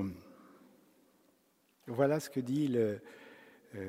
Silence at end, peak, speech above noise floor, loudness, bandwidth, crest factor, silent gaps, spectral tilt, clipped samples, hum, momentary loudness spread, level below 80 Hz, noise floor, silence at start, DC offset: 0 s; -18 dBFS; 40 dB; -34 LUFS; 16 kHz; 20 dB; none; -7 dB/octave; under 0.1%; none; 23 LU; -76 dBFS; -72 dBFS; 0 s; under 0.1%